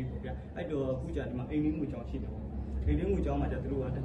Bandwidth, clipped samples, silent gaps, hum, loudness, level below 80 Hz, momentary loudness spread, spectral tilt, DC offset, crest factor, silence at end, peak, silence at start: 8 kHz; under 0.1%; none; none; -35 LUFS; -40 dBFS; 9 LU; -9.5 dB/octave; under 0.1%; 14 dB; 0 s; -18 dBFS; 0 s